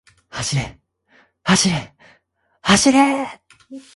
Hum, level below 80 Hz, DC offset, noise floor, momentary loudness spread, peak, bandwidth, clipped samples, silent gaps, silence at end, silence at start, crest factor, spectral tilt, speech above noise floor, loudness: none; -48 dBFS; under 0.1%; -63 dBFS; 16 LU; 0 dBFS; 11.5 kHz; under 0.1%; none; 0.15 s; 0.35 s; 20 dB; -3.5 dB/octave; 46 dB; -17 LUFS